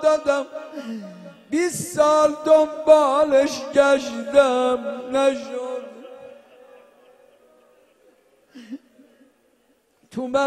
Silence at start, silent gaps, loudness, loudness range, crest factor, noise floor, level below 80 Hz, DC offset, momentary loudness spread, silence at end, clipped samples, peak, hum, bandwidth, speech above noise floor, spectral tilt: 0 s; none; -19 LUFS; 16 LU; 20 dB; -63 dBFS; -62 dBFS; under 0.1%; 23 LU; 0 s; under 0.1%; -2 dBFS; none; 13.5 kHz; 44 dB; -4 dB/octave